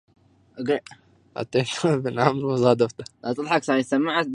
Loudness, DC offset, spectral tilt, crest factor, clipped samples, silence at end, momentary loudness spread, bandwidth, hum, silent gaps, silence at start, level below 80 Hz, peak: -23 LUFS; under 0.1%; -5.5 dB/octave; 22 dB; under 0.1%; 0 s; 11 LU; 11.5 kHz; none; none; 0.55 s; -64 dBFS; -2 dBFS